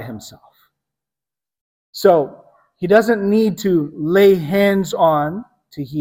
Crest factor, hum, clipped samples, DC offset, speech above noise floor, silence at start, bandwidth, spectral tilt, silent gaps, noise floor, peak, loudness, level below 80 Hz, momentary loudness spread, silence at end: 16 dB; none; under 0.1%; under 0.1%; over 74 dB; 0 s; 16.5 kHz; -6.5 dB/octave; 1.61-1.93 s; under -90 dBFS; 0 dBFS; -16 LUFS; -56 dBFS; 19 LU; 0 s